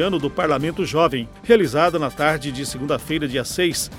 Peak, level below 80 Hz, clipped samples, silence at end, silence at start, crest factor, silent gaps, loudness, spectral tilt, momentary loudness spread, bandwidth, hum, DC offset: -2 dBFS; -44 dBFS; under 0.1%; 0 s; 0 s; 18 dB; none; -20 LUFS; -4.5 dB/octave; 8 LU; 16.5 kHz; none; under 0.1%